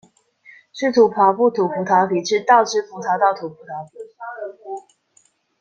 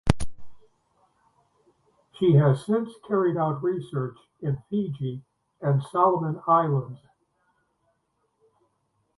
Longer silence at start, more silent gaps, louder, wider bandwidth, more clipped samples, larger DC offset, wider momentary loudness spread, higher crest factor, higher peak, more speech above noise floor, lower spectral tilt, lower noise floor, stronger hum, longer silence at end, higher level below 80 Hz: first, 0.75 s vs 0.05 s; neither; first, -17 LUFS vs -25 LUFS; second, 8.8 kHz vs 11.5 kHz; neither; neither; first, 19 LU vs 14 LU; second, 18 dB vs 26 dB; about the same, -2 dBFS vs 0 dBFS; second, 42 dB vs 49 dB; second, -4.5 dB/octave vs -8.5 dB/octave; second, -60 dBFS vs -73 dBFS; neither; second, 0.8 s vs 2.2 s; second, -70 dBFS vs -46 dBFS